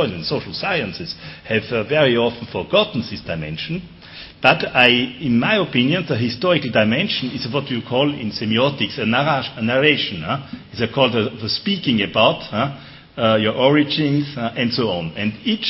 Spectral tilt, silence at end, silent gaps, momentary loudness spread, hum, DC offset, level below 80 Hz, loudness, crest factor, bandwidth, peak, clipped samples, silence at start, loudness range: -8 dB/octave; 0 s; none; 11 LU; none; under 0.1%; -52 dBFS; -19 LUFS; 20 dB; 6 kHz; 0 dBFS; under 0.1%; 0 s; 3 LU